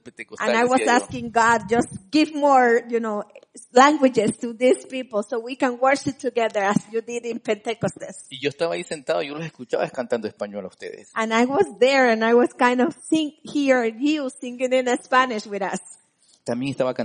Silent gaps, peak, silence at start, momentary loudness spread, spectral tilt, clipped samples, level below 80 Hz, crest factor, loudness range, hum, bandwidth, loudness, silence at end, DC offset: none; -2 dBFS; 0.05 s; 13 LU; -4.5 dB/octave; under 0.1%; -64 dBFS; 20 dB; 7 LU; none; 10 kHz; -21 LUFS; 0 s; under 0.1%